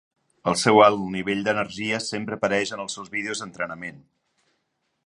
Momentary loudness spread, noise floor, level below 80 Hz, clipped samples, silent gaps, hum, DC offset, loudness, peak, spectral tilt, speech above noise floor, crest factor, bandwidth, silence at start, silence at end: 15 LU; -75 dBFS; -62 dBFS; under 0.1%; none; none; under 0.1%; -23 LUFS; -2 dBFS; -4 dB/octave; 51 dB; 24 dB; 11.5 kHz; 0.45 s; 1.05 s